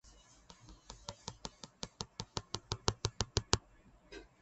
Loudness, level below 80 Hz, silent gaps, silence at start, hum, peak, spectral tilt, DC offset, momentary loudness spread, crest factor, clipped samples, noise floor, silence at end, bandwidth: -40 LUFS; -54 dBFS; none; 0.05 s; none; -8 dBFS; -3 dB/octave; under 0.1%; 22 LU; 34 dB; under 0.1%; -64 dBFS; 0.15 s; 8.4 kHz